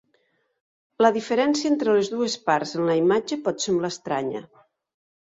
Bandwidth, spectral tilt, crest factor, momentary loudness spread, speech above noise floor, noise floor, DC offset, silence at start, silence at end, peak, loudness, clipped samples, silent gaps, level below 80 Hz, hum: 7.8 kHz; -4.5 dB/octave; 20 dB; 7 LU; 46 dB; -68 dBFS; under 0.1%; 1 s; 0.95 s; -4 dBFS; -23 LUFS; under 0.1%; none; -68 dBFS; none